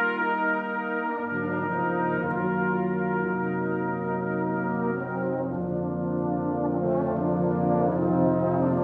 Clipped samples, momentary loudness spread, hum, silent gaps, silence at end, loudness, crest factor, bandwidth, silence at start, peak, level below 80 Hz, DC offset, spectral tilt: under 0.1%; 5 LU; none; none; 0 s; -26 LUFS; 16 dB; 4.5 kHz; 0 s; -10 dBFS; -58 dBFS; under 0.1%; -11 dB/octave